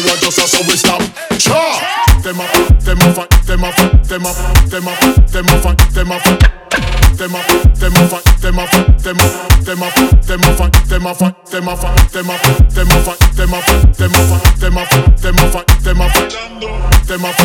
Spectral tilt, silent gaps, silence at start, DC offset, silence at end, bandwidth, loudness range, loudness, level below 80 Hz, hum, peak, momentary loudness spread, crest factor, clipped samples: -4 dB/octave; none; 0 s; under 0.1%; 0 s; 20 kHz; 1 LU; -11 LUFS; -12 dBFS; none; 0 dBFS; 6 LU; 10 dB; 2%